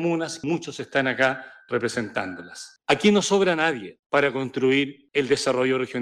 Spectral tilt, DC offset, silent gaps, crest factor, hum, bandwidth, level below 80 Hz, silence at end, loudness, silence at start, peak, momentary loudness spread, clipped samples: -4.5 dB/octave; under 0.1%; 3.99-4.10 s; 16 dB; none; 11.5 kHz; -66 dBFS; 0 s; -23 LUFS; 0 s; -8 dBFS; 12 LU; under 0.1%